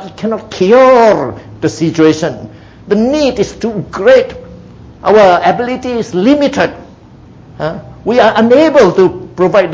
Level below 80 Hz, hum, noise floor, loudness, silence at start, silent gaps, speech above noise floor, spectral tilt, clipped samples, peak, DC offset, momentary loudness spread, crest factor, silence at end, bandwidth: -40 dBFS; none; -36 dBFS; -10 LUFS; 0 s; none; 27 dB; -6 dB/octave; 0.4%; 0 dBFS; under 0.1%; 14 LU; 10 dB; 0 s; 7.8 kHz